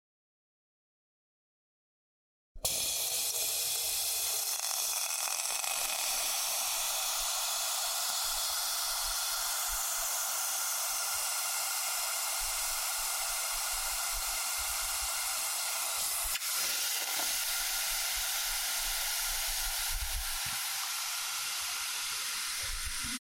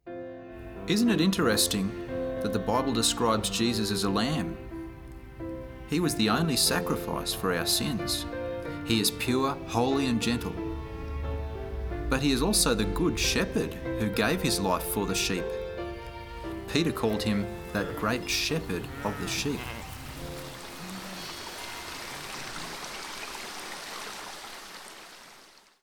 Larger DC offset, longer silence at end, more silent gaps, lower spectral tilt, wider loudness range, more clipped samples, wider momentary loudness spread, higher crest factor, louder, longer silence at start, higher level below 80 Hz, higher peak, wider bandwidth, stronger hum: neither; second, 0 s vs 0.35 s; neither; second, 2 dB/octave vs -4 dB/octave; second, 2 LU vs 11 LU; neither; second, 3 LU vs 16 LU; about the same, 20 dB vs 20 dB; about the same, -31 LUFS vs -29 LUFS; first, 2.55 s vs 0.05 s; second, -52 dBFS vs -44 dBFS; second, -14 dBFS vs -10 dBFS; second, 17 kHz vs over 20 kHz; neither